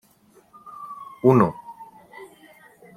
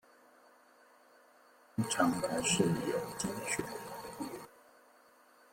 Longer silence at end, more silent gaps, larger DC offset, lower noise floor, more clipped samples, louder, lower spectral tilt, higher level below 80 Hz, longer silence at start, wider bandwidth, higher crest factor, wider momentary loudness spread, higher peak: second, 0.7 s vs 1.05 s; neither; neither; second, -57 dBFS vs -63 dBFS; neither; first, -19 LUFS vs -35 LUFS; first, -9.5 dB/octave vs -4 dB/octave; about the same, -64 dBFS vs -68 dBFS; second, 0.8 s vs 1.75 s; second, 14.5 kHz vs 16.5 kHz; about the same, 22 dB vs 22 dB; first, 27 LU vs 14 LU; first, -2 dBFS vs -16 dBFS